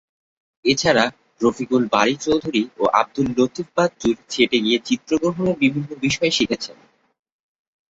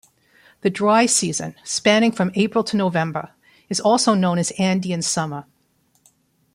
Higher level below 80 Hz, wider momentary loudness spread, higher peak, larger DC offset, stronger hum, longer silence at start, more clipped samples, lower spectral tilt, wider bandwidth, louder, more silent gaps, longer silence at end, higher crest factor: first, -54 dBFS vs -62 dBFS; second, 6 LU vs 10 LU; first, 0 dBFS vs -4 dBFS; neither; neither; about the same, 0.65 s vs 0.65 s; neither; about the same, -4.5 dB/octave vs -4 dB/octave; second, 8 kHz vs 15.5 kHz; about the same, -20 LUFS vs -19 LUFS; neither; about the same, 1.2 s vs 1.1 s; about the same, 20 dB vs 18 dB